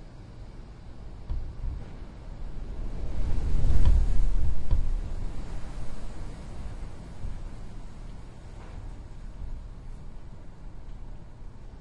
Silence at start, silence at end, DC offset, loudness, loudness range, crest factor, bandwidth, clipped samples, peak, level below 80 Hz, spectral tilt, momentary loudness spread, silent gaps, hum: 0 s; 0 s; under 0.1%; -36 LUFS; 14 LU; 18 dB; 5.2 kHz; under 0.1%; -6 dBFS; -30 dBFS; -7.5 dB/octave; 17 LU; none; none